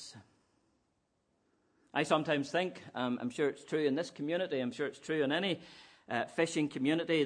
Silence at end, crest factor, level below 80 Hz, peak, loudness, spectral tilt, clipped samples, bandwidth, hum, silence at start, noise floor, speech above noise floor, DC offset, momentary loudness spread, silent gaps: 0 s; 22 dB; -80 dBFS; -14 dBFS; -34 LUFS; -5 dB/octave; under 0.1%; 10.5 kHz; none; 0 s; -78 dBFS; 45 dB; under 0.1%; 8 LU; none